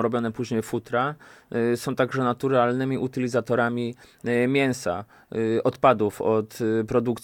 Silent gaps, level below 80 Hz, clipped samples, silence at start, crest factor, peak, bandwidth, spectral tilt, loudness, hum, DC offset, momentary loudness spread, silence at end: none; -60 dBFS; under 0.1%; 0 s; 20 dB; -4 dBFS; 17.5 kHz; -6.5 dB/octave; -25 LUFS; none; under 0.1%; 9 LU; 0.05 s